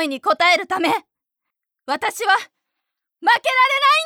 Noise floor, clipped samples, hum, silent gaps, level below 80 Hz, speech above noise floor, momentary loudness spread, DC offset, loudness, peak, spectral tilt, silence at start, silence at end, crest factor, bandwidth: -82 dBFS; under 0.1%; none; none; -74 dBFS; 64 dB; 9 LU; under 0.1%; -18 LUFS; -4 dBFS; -1 dB/octave; 0 s; 0 s; 16 dB; 18 kHz